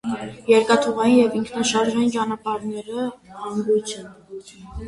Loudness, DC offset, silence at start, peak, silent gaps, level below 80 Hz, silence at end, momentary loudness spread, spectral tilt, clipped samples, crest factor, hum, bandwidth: -21 LUFS; under 0.1%; 0.05 s; -2 dBFS; none; -48 dBFS; 0 s; 21 LU; -4 dB/octave; under 0.1%; 18 dB; none; 11.5 kHz